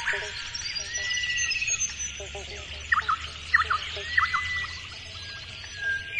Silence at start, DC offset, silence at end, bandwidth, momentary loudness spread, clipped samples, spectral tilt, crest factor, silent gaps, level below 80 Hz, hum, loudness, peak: 0 s; under 0.1%; 0 s; 11.5 kHz; 13 LU; under 0.1%; 0 dB/octave; 22 dB; none; -50 dBFS; none; -28 LUFS; -8 dBFS